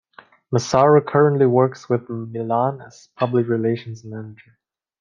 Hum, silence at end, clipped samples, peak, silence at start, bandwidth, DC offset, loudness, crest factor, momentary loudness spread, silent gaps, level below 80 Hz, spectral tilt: none; 0.65 s; under 0.1%; -2 dBFS; 0.5 s; 7.4 kHz; under 0.1%; -19 LUFS; 18 dB; 19 LU; none; -62 dBFS; -7 dB/octave